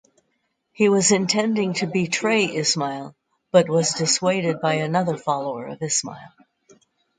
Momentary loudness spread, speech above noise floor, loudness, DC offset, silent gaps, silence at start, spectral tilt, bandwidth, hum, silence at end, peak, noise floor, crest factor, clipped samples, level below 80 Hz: 12 LU; 51 dB; -21 LUFS; under 0.1%; none; 0.8 s; -3.5 dB/octave; 9.6 kHz; none; 0.9 s; -2 dBFS; -72 dBFS; 20 dB; under 0.1%; -66 dBFS